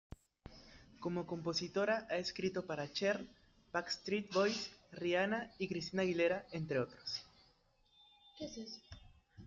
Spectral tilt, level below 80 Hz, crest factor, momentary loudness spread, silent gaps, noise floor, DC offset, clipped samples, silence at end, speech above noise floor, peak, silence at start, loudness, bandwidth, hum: -4.5 dB/octave; -68 dBFS; 18 dB; 21 LU; none; -73 dBFS; under 0.1%; under 0.1%; 0 s; 34 dB; -22 dBFS; 0.45 s; -39 LUFS; 7.8 kHz; none